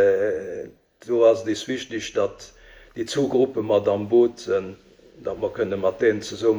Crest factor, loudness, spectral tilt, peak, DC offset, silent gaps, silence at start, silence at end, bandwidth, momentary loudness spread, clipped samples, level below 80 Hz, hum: 18 dB; -23 LUFS; -5.5 dB/octave; -6 dBFS; under 0.1%; none; 0 s; 0 s; 20 kHz; 15 LU; under 0.1%; -58 dBFS; none